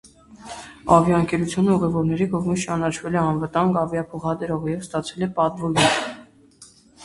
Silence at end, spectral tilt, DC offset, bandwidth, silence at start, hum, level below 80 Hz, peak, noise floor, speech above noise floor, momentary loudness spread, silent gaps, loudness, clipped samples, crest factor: 0 s; -5.5 dB/octave; under 0.1%; 11.5 kHz; 0.3 s; none; -50 dBFS; 0 dBFS; -50 dBFS; 29 dB; 11 LU; none; -21 LUFS; under 0.1%; 22 dB